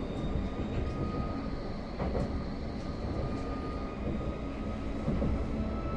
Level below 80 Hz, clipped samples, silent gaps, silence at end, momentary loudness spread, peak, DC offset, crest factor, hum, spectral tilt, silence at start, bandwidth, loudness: -38 dBFS; under 0.1%; none; 0 s; 5 LU; -18 dBFS; under 0.1%; 14 dB; none; -8 dB/octave; 0 s; 9 kHz; -36 LUFS